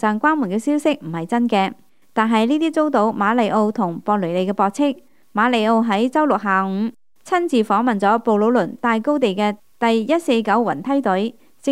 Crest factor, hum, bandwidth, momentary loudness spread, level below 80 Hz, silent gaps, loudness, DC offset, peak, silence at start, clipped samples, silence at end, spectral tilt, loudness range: 16 dB; none; 13 kHz; 6 LU; -70 dBFS; none; -19 LUFS; 0.3%; -2 dBFS; 0 s; under 0.1%; 0 s; -6 dB/octave; 1 LU